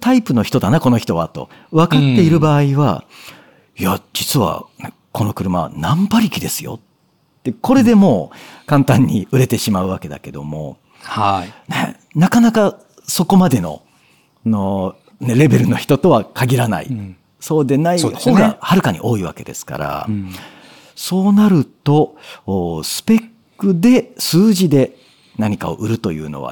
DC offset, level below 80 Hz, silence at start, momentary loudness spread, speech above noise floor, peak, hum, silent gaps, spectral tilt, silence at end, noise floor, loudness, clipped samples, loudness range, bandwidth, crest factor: under 0.1%; -48 dBFS; 0 s; 15 LU; 44 dB; 0 dBFS; none; none; -6 dB/octave; 0 s; -58 dBFS; -15 LUFS; under 0.1%; 4 LU; 19 kHz; 14 dB